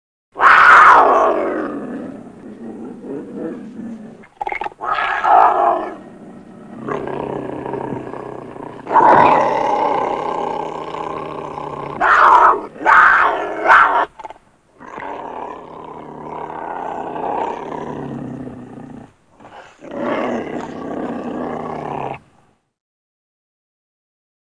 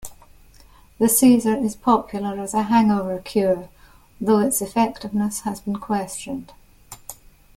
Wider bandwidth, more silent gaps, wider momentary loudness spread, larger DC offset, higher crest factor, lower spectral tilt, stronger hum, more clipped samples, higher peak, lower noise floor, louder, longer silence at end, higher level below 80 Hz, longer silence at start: second, 10.5 kHz vs 16.5 kHz; neither; first, 23 LU vs 17 LU; neither; about the same, 18 dB vs 18 dB; about the same, -5 dB/octave vs -5 dB/octave; neither; neither; first, 0 dBFS vs -4 dBFS; first, -56 dBFS vs -49 dBFS; first, -14 LUFS vs -21 LUFS; first, 2.35 s vs 0.45 s; about the same, -52 dBFS vs -52 dBFS; first, 0.35 s vs 0 s